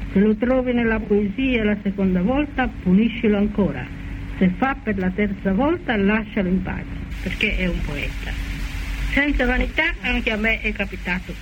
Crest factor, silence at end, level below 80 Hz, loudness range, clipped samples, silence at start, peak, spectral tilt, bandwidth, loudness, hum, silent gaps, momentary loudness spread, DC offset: 16 dB; 0 s; -30 dBFS; 4 LU; under 0.1%; 0 s; -6 dBFS; -7 dB/octave; 16.5 kHz; -21 LUFS; none; none; 10 LU; under 0.1%